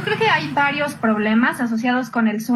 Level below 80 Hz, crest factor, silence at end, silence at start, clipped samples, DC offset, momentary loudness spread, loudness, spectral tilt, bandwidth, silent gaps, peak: -62 dBFS; 14 dB; 0 s; 0 s; under 0.1%; under 0.1%; 3 LU; -19 LUFS; -5 dB/octave; 13 kHz; none; -4 dBFS